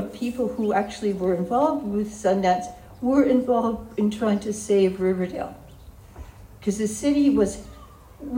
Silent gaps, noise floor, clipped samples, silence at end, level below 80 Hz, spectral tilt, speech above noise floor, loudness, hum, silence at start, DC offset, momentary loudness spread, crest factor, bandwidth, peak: none; -45 dBFS; under 0.1%; 0 s; -48 dBFS; -6 dB/octave; 23 dB; -23 LUFS; none; 0 s; under 0.1%; 11 LU; 18 dB; 16 kHz; -6 dBFS